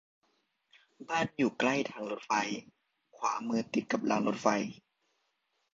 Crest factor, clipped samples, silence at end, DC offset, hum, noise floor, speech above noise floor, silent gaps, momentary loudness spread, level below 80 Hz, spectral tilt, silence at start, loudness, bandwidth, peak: 24 dB; under 0.1%; 1 s; under 0.1%; none; -79 dBFS; 47 dB; none; 9 LU; -74 dBFS; -4.5 dB/octave; 1 s; -32 LUFS; 7.8 kHz; -12 dBFS